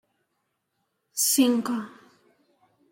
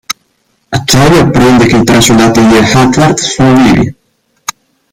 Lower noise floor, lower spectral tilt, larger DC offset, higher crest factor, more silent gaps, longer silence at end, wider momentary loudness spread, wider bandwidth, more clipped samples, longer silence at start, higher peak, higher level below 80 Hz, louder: first, -77 dBFS vs -56 dBFS; second, -2 dB/octave vs -5 dB/octave; neither; first, 20 dB vs 8 dB; neither; about the same, 1.05 s vs 1 s; about the same, 15 LU vs 16 LU; about the same, 16.5 kHz vs 17 kHz; second, under 0.1% vs 0.3%; first, 1.15 s vs 0.1 s; second, -10 dBFS vs 0 dBFS; second, -78 dBFS vs -30 dBFS; second, -24 LUFS vs -6 LUFS